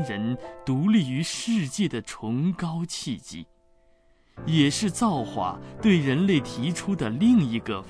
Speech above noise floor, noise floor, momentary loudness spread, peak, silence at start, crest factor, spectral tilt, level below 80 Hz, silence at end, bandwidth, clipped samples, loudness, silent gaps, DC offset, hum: 35 dB; -60 dBFS; 11 LU; -8 dBFS; 0 s; 18 dB; -5.5 dB/octave; -54 dBFS; 0 s; 11 kHz; under 0.1%; -25 LUFS; none; under 0.1%; none